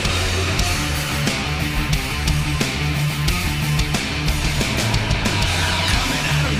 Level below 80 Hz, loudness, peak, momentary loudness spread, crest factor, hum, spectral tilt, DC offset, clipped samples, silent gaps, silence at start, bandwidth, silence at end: -26 dBFS; -20 LUFS; -6 dBFS; 3 LU; 14 dB; none; -4 dB/octave; under 0.1%; under 0.1%; none; 0 s; 16 kHz; 0 s